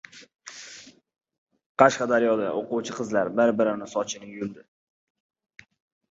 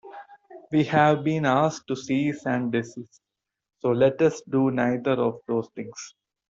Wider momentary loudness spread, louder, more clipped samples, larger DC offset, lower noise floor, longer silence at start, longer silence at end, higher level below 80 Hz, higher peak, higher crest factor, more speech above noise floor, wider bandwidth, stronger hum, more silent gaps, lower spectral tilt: first, 22 LU vs 17 LU; about the same, -24 LUFS vs -24 LUFS; neither; neither; about the same, -48 dBFS vs -47 dBFS; about the same, 0.15 s vs 0.05 s; first, 1.55 s vs 0.45 s; second, -70 dBFS vs -64 dBFS; first, -2 dBFS vs -6 dBFS; first, 26 dB vs 18 dB; about the same, 24 dB vs 24 dB; about the same, 8 kHz vs 7.8 kHz; neither; first, 1.38-1.47 s, 1.66-1.75 s vs none; second, -4.5 dB/octave vs -6.5 dB/octave